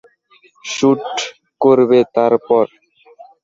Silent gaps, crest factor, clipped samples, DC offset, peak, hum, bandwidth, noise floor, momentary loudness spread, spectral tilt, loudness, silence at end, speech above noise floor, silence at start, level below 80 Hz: none; 14 dB; under 0.1%; under 0.1%; -2 dBFS; none; 7.8 kHz; -52 dBFS; 13 LU; -5 dB/octave; -15 LUFS; 0.8 s; 39 dB; 0.65 s; -60 dBFS